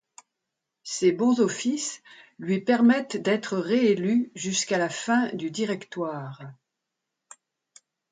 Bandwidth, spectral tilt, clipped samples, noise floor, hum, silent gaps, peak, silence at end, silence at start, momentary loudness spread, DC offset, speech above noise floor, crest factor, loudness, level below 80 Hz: 9.6 kHz; -4.5 dB/octave; under 0.1%; -84 dBFS; none; none; -10 dBFS; 1.6 s; 0.85 s; 16 LU; under 0.1%; 59 dB; 16 dB; -25 LUFS; -74 dBFS